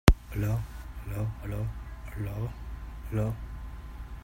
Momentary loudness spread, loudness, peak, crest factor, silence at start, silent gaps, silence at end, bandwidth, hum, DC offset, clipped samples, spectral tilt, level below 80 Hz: 12 LU; -35 LUFS; 0 dBFS; 30 dB; 0.05 s; none; 0 s; 16.5 kHz; none; under 0.1%; under 0.1%; -6.5 dB/octave; -34 dBFS